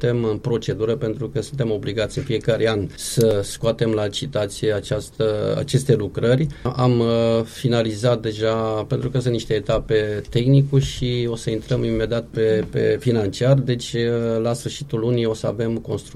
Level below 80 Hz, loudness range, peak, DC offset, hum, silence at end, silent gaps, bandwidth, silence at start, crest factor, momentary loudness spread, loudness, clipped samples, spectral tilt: -42 dBFS; 2 LU; -4 dBFS; under 0.1%; none; 0 s; none; 14.5 kHz; 0 s; 16 dB; 6 LU; -21 LUFS; under 0.1%; -6.5 dB/octave